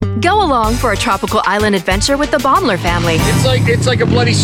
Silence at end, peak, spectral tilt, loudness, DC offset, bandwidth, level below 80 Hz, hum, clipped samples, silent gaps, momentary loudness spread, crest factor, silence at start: 0 s; -2 dBFS; -5 dB/octave; -13 LUFS; under 0.1%; 17 kHz; -26 dBFS; none; under 0.1%; none; 2 LU; 10 dB; 0 s